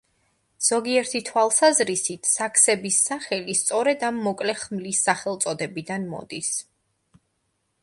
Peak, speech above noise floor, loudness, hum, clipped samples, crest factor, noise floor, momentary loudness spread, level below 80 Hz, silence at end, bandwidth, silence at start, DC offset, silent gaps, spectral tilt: -4 dBFS; 50 dB; -22 LUFS; none; under 0.1%; 22 dB; -73 dBFS; 12 LU; -68 dBFS; 1.2 s; 12 kHz; 0.6 s; under 0.1%; none; -2 dB/octave